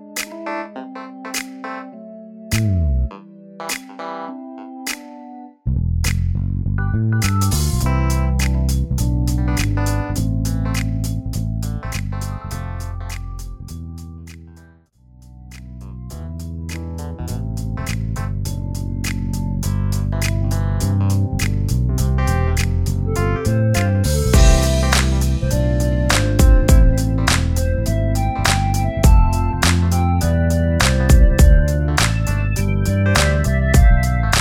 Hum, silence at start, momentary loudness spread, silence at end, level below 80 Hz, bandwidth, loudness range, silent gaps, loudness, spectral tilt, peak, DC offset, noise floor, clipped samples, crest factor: none; 0 s; 17 LU; 0 s; -20 dBFS; 17 kHz; 13 LU; none; -19 LUFS; -5.5 dB/octave; 0 dBFS; under 0.1%; -49 dBFS; under 0.1%; 16 dB